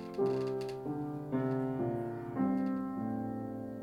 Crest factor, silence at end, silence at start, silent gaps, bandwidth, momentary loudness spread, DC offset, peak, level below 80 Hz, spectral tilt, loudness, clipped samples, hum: 14 dB; 0 s; 0 s; none; 12.5 kHz; 6 LU; under 0.1%; -22 dBFS; -66 dBFS; -9 dB/octave; -36 LUFS; under 0.1%; none